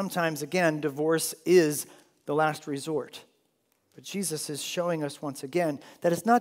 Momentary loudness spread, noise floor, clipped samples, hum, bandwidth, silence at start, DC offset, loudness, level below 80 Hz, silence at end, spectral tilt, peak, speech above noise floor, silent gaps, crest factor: 14 LU; -72 dBFS; under 0.1%; none; 16 kHz; 0 s; under 0.1%; -28 LUFS; -82 dBFS; 0 s; -4.5 dB/octave; -8 dBFS; 45 dB; none; 20 dB